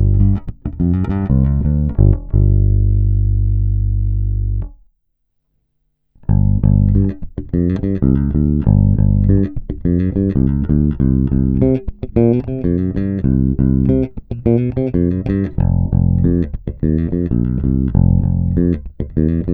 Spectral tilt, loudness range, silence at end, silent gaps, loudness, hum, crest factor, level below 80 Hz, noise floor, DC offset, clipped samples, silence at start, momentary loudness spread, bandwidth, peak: -13 dB/octave; 4 LU; 0 s; none; -16 LUFS; none; 14 dB; -20 dBFS; -67 dBFS; under 0.1%; under 0.1%; 0 s; 7 LU; 2.8 kHz; 0 dBFS